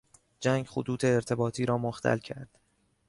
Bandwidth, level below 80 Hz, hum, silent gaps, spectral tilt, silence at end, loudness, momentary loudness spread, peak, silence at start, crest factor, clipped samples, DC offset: 11.5 kHz; -62 dBFS; none; none; -6 dB/octave; 0.65 s; -30 LUFS; 6 LU; -14 dBFS; 0.4 s; 18 dB; under 0.1%; under 0.1%